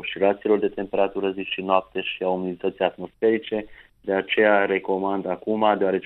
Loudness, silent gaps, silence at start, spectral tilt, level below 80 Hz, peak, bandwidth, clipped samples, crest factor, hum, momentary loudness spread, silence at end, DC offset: -23 LUFS; none; 0 s; -8.5 dB/octave; -60 dBFS; -4 dBFS; 4.2 kHz; under 0.1%; 18 dB; none; 8 LU; 0 s; under 0.1%